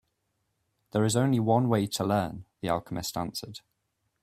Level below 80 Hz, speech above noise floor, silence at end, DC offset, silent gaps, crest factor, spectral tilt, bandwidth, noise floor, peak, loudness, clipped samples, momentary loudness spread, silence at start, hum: -60 dBFS; 51 dB; 0.65 s; under 0.1%; none; 18 dB; -5.5 dB/octave; 16 kHz; -78 dBFS; -10 dBFS; -28 LUFS; under 0.1%; 13 LU; 0.95 s; none